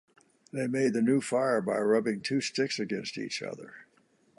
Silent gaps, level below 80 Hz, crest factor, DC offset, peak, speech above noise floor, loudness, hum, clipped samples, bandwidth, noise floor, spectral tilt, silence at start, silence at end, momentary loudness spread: none; -76 dBFS; 16 dB; under 0.1%; -14 dBFS; 38 dB; -29 LUFS; none; under 0.1%; 11.5 kHz; -67 dBFS; -5 dB/octave; 0.55 s; 0.55 s; 12 LU